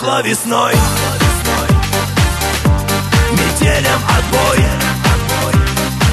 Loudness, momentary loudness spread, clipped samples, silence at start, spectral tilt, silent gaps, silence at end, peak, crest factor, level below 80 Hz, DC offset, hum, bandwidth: -13 LUFS; 2 LU; under 0.1%; 0 s; -4.5 dB/octave; none; 0 s; 0 dBFS; 12 dB; -20 dBFS; under 0.1%; none; 13.5 kHz